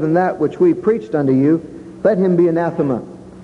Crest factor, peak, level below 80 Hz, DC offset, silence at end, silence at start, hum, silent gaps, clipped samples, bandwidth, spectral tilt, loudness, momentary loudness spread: 14 dB; -2 dBFS; -52 dBFS; under 0.1%; 0 s; 0 s; none; none; under 0.1%; 7.2 kHz; -10 dB/octave; -16 LUFS; 6 LU